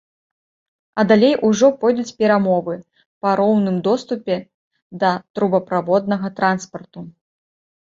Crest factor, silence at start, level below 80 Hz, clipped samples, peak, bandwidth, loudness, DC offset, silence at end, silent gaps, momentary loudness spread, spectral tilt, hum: 18 dB; 0.95 s; -62 dBFS; under 0.1%; -2 dBFS; 7.6 kHz; -18 LUFS; under 0.1%; 0.75 s; 3.06-3.21 s, 4.54-4.71 s, 4.82-4.90 s, 5.30-5.34 s; 14 LU; -6 dB/octave; none